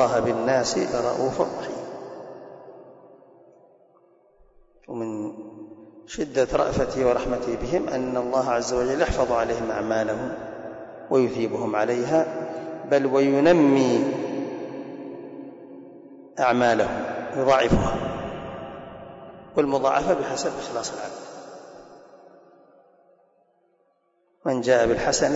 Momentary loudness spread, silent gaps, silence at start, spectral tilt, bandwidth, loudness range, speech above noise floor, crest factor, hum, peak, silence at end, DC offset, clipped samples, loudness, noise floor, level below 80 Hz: 21 LU; none; 0 s; -5 dB/octave; 8 kHz; 16 LU; 45 dB; 16 dB; none; -8 dBFS; 0 s; under 0.1%; under 0.1%; -24 LUFS; -67 dBFS; -46 dBFS